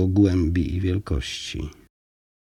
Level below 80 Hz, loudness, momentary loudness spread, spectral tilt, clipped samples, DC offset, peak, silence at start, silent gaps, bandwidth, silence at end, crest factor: -38 dBFS; -24 LUFS; 14 LU; -6.5 dB/octave; under 0.1%; under 0.1%; -6 dBFS; 0 s; none; 10.5 kHz; 0.75 s; 18 dB